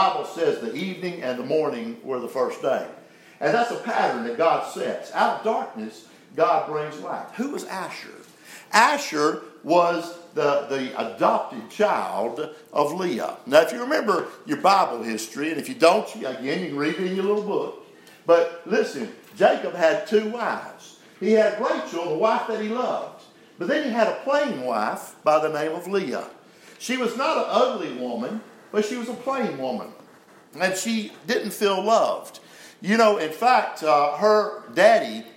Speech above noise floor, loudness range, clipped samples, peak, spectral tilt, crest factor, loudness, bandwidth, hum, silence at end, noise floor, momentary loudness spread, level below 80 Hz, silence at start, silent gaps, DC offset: 28 dB; 4 LU; under 0.1%; -2 dBFS; -4 dB/octave; 22 dB; -23 LUFS; 16 kHz; none; 0.05 s; -51 dBFS; 13 LU; -82 dBFS; 0 s; none; under 0.1%